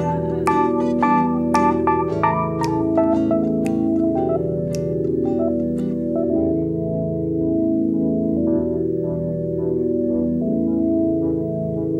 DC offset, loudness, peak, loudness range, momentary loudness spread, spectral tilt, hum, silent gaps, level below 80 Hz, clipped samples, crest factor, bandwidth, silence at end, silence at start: under 0.1%; -20 LUFS; -4 dBFS; 3 LU; 5 LU; -8.5 dB/octave; none; none; -44 dBFS; under 0.1%; 14 dB; 11 kHz; 0 s; 0 s